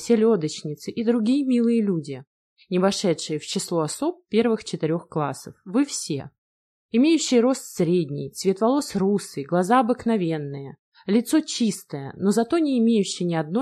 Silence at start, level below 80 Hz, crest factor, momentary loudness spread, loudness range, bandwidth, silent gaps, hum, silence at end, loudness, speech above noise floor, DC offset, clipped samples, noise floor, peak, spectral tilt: 0 s; -66 dBFS; 16 dB; 10 LU; 3 LU; 14 kHz; 2.27-2.56 s, 6.38-6.89 s, 10.79-10.92 s; none; 0 s; -23 LUFS; over 68 dB; under 0.1%; under 0.1%; under -90 dBFS; -6 dBFS; -5.5 dB/octave